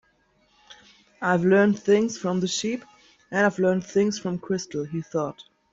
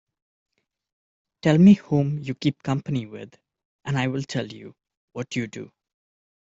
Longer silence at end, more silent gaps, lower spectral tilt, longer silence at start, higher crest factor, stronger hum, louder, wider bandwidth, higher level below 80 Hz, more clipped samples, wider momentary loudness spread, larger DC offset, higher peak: second, 0.3 s vs 0.9 s; second, none vs 3.65-3.79 s, 4.97-5.08 s; second, -5.5 dB/octave vs -7.5 dB/octave; second, 0.7 s vs 1.45 s; about the same, 16 dB vs 20 dB; neither; about the same, -24 LUFS vs -22 LUFS; about the same, 7.8 kHz vs 7.8 kHz; about the same, -66 dBFS vs -62 dBFS; neither; second, 11 LU vs 24 LU; neither; second, -8 dBFS vs -4 dBFS